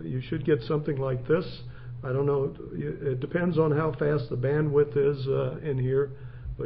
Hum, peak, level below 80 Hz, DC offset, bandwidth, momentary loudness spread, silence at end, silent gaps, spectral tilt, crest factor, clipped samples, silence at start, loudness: none; -12 dBFS; -48 dBFS; under 0.1%; 5.4 kHz; 11 LU; 0 s; none; -12 dB/octave; 16 dB; under 0.1%; 0 s; -27 LUFS